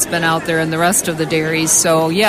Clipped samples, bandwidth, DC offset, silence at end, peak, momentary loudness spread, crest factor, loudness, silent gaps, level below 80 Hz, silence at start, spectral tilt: under 0.1%; 16 kHz; under 0.1%; 0 s; -2 dBFS; 6 LU; 14 dB; -14 LUFS; none; -48 dBFS; 0 s; -3 dB/octave